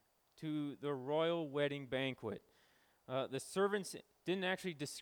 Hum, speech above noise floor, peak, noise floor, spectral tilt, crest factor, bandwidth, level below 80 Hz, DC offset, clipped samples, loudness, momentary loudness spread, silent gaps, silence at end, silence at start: none; 33 dB; -24 dBFS; -73 dBFS; -5 dB/octave; 16 dB; over 20 kHz; -82 dBFS; under 0.1%; under 0.1%; -40 LUFS; 10 LU; none; 0 s; 0.35 s